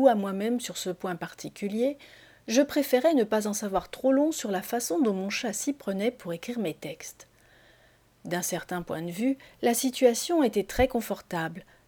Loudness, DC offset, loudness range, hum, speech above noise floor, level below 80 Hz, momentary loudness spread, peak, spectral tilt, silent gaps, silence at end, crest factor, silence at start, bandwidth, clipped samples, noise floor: -28 LUFS; under 0.1%; 7 LU; none; 33 dB; -54 dBFS; 12 LU; -6 dBFS; -4 dB/octave; none; 0.25 s; 22 dB; 0 s; over 20 kHz; under 0.1%; -61 dBFS